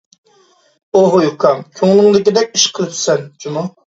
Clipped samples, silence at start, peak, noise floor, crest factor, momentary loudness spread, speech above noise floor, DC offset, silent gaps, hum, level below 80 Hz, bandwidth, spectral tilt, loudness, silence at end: under 0.1%; 0.95 s; 0 dBFS; -52 dBFS; 14 dB; 12 LU; 39 dB; under 0.1%; none; none; -60 dBFS; 8 kHz; -4 dB/octave; -13 LUFS; 0.3 s